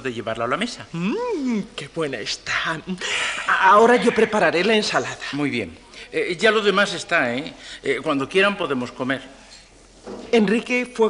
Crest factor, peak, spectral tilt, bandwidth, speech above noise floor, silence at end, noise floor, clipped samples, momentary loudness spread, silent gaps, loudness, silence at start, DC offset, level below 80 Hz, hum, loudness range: 16 dB; -4 dBFS; -4 dB/octave; 11 kHz; 27 dB; 0 s; -48 dBFS; under 0.1%; 11 LU; none; -21 LUFS; 0 s; under 0.1%; -56 dBFS; none; 6 LU